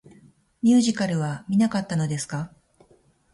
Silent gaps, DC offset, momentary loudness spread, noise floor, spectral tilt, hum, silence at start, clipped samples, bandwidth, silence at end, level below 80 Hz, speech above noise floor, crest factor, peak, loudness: none; under 0.1%; 12 LU; -60 dBFS; -5.5 dB/octave; none; 0.65 s; under 0.1%; 11.5 kHz; 0.85 s; -62 dBFS; 38 dB; 16 dB; -10 dBFS; -23 LUFS